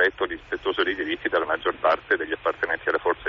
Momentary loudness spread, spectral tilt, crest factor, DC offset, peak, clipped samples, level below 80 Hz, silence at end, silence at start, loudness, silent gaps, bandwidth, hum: 5 LU; -0.5 dB/octave; 16 dB; under 0.1%; -10 dBFS; under 0.1%; -54 dBFS; 0 s; 0 s; -25 LUFS; none; 7 kHz; none